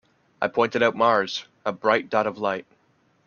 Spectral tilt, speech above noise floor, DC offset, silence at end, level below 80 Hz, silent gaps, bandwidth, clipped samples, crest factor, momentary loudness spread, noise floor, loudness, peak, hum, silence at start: -4.5 dB/octave; 41 dB; under 0.1%; 0.65 s; -68 dBFS; none; 7 kHz; under 0.1%; 20 dB; 9 LU; -64 dBFS; -23 LUFS; -4 dBFS; none; 0.4 s